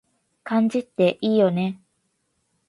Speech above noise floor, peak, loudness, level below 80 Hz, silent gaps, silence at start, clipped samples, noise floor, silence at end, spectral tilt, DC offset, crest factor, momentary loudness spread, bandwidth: 51 dB; -6 dBFS; -22 LUFS; -68 dBFS; none; 0.45 s; under 0.1%; -72 dBFS; 0.95 s; -7.5 dB/octave; under 0.1%; 16 dB; 15 LU; 11.5 kHz